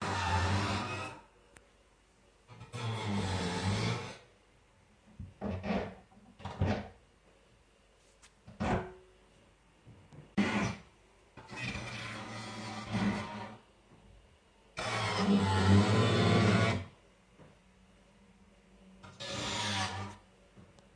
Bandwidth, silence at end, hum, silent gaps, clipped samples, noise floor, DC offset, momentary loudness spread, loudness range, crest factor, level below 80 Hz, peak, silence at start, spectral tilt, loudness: 10.5 kHz; 0.3 s; none; none; under 0.1%; -65 dBFS; under 0.1%; 22 LU; 11 LU; 22 dB; -56 dBFS; -14 dBFS; 0 s; -5.5 dB/octave; -33 LUFS